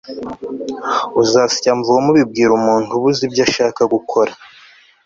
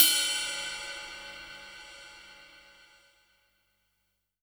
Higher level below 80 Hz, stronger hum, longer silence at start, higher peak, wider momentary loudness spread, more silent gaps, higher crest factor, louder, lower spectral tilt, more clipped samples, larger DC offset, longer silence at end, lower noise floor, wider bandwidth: first, -54 dBFS vs -68 dBFS; second, none vs 50 Hz at -80 dBFS; about the same, 0.05 s vs 0 s; about the same, 0 dBFS vs 0 dBFS; second, 12 LU vs 23 LU; neither; second, 14 dB vs 34 dB; first, -15 LUFS vs -29 LUFS; first, -4.5 dB/octave vs 2 dB/octave; neither; neither; second, 0.6 s vs 1.85 s; second, -46 dBFS vs -79 dBFS; second, 7.8 kHz vs over 20 kHz